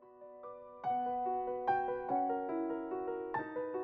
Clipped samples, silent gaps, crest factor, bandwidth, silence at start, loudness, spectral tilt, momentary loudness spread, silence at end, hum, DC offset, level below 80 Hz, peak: under 0.1%; none; 16 dB; 5.2 kHz; 0 s; -37 LUFS; -5 dB/octave; 16 LU; 0 s; none; under 0.1%; -72 dBFS; -22 dBFS